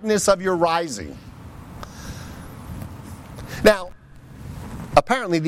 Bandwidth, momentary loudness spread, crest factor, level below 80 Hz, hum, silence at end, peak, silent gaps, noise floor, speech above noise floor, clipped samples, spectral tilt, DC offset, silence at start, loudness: 16.5 kHz; 21 LU; 22 dB; -42 dBFS; none; 0 s; -2 dBFS; none; -42 dBFS; 23 dB; under 0.1%; -4.5 dB/octave; under 0.1%; 0 s; -20 LUFS